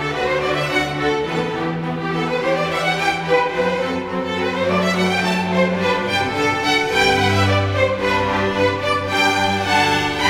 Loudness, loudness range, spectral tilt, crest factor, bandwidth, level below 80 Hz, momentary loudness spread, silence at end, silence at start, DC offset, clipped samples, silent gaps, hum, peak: -18 LUFS; 3 LU; -4.5 dB/octave; 16 dB; 17.5 kHz; -46 dBFS; 6 LU; 0 s; 0 s; under 0.1%; under 0.1%; none; none; -2 dBFS